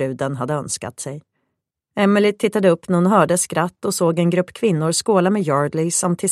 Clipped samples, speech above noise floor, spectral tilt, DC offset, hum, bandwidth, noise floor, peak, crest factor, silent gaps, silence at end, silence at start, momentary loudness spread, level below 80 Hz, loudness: under 0.1%; 59 dB; -5 dB/octave; under 0.1%; none; 14.5 kHz; -77 dBFS; 0 dBFS; 18 dB; none; 0 s; 0 s; 10 LU; -62 dBFS; -18 LUFS